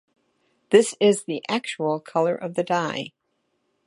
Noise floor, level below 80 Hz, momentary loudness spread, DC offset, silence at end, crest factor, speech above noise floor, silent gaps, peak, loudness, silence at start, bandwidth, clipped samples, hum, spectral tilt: -73 dBFS; -76 dBFS; 9 LU; under 0.1%; 0.75 s; 22 dB; 51 dB; none; -2 dBFS; -23 LUFS; 0.7 s; 11.5 kHz; under 0.1%; none; -4.5 dB/octave